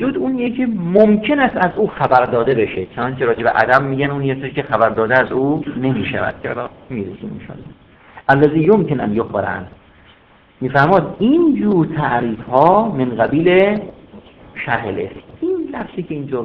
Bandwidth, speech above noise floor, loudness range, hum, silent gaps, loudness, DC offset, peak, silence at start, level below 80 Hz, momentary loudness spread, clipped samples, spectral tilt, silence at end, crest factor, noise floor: 5.4 kHz; 33 dB; 4 LU; none; none; -16 LUFS; under 0.1%; 0 dBFS; 0 s; -46 dBFS; 14 LU; 0.1%; -9.5 dB/octave; 0 s; 16 dB; -49 dBFS